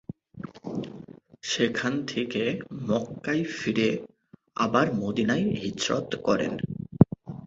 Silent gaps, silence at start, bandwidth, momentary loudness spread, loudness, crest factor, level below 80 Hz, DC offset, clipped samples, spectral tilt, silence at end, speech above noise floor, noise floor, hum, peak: none; 0.35 s; 8 kHz; 16 LU; -27 LUFS; 26 dB; -56 dBFS; under 0.1%; under 0.1%; -5.5 dB/octave; 0 s; 20 dB; -46 dBFS; none; -2 dBFS